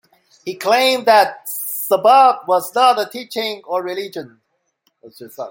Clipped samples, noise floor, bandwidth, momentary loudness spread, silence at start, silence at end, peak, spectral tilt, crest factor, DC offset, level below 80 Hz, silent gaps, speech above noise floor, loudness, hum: under 0.1%; -66 dBFS; 17 kHz; 19 LU; 0.45 s; 0 s; -2 dBFS; -2 dB/octave; 16 dB; under 0.1%; -72 dBFS; none; 50 dB; -16 LUFS; none